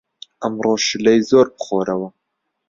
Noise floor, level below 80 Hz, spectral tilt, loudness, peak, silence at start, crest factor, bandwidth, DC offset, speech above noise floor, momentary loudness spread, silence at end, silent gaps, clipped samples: -75 dBFS; -58 dBFS; -4 dB/octave; -17 LUFS; -2 dBFS; 0.4 s; 16 dB; 7.6 kHz; under 0.1%; 58 dB; 12 LU; 0.6 s; none; under 0.1%